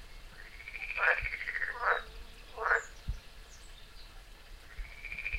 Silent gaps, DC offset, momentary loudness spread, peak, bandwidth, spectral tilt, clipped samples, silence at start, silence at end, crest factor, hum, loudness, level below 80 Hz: none; under 0.1%; 23 LU; -14 dBFS; 16 kHz; -3 dB/octave; under 0.1%; 0 s; 0 s; 22 dB; none; -33 LUFS; -48 dBFS